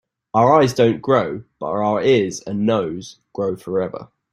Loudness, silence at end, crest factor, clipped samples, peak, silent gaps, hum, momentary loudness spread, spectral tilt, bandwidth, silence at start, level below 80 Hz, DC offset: -19 LUFS; 0.25 s; 18 dB; under 0.1%; -2 dBFS; none; none; 14 LU; -6 dB/octave; 15 kHz; 0.35 s; -56 dBFS; under 0.1%